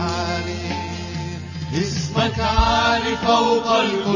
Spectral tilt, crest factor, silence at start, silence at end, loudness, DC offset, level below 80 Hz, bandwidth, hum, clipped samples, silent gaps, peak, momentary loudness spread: -5 dB/octave; 16 dB; 0 s; 0 s; -20 LUFS; under 0.1%; -32 dBFS; 7.4 kHz; none; under 0.1%; none; -4 dBFS; 12 LU